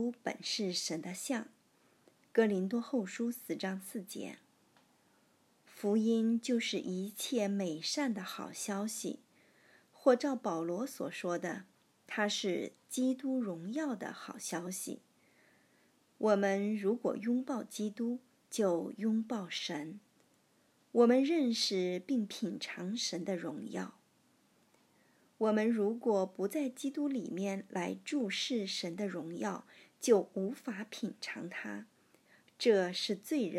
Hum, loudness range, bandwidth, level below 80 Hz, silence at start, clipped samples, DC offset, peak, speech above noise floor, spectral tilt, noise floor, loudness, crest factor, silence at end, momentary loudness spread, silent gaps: none; 5 LU; 14.5 kHz; under -90 dBFS; 0 s; under 0.1%; under 0.1%; -14 dBFS; 36 dB; -4.5 dB/octave; -71 dBFS; -35 LUFS; 22 dB; 0 s; 12 LU; none